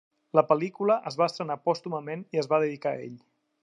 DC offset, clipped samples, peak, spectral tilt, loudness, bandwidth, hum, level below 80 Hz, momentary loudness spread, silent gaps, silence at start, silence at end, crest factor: under 0.1%; under 0.1%; -6 dBFS; -6.5 dB/octave; -27 LUFS; 9.8 kHz; none; -82 dBFS; 10 LU; none; 0.35 s; 0.45 s; 22 dB